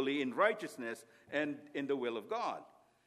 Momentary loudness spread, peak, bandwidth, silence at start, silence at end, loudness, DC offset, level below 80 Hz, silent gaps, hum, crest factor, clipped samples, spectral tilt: 12 LU; -16 dBFS; 14.5 kHz; 0 s; 0.4 s; -37 LUFS; under 0.1%; -88 dBFS; none; none; 22 dB; under 0.1%; -4.5 dB/octave